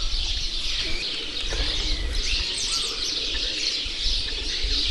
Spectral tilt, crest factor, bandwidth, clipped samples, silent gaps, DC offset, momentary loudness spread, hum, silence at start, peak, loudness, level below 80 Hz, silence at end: -1.5 dB/octave; 16 dB; 12 kHz; under 0.1%; none; under 0.1%; 3 LU; none; 0 s; -10 dBFS; -25 LUFS; -30 dBFS; 0 s